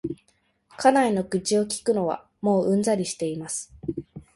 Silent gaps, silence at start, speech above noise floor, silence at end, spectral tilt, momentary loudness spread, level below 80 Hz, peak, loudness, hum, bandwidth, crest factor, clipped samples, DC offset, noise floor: none; 0.05 s; 44 dB; 0.15 s; -5 dB/octave; 14 LU; -58 dBFS; -6 dBFS; -24 LUFS; none; 11.5 kHz; 20 dB; under 0.1%; under 0.1%; -67 dBFS